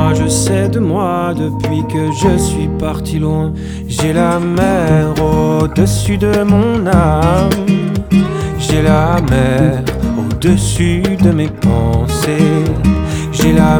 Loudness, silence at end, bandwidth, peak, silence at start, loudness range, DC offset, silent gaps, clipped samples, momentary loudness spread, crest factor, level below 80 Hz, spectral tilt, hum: -13 LUFS; 0 s; over 20 kHz; 0 dBFS; 0 s; 3 LU; under 0.1%; none; under 0.1%; 6 LU; 12 dB; -24 dBFS; -6.5 dB/octave; none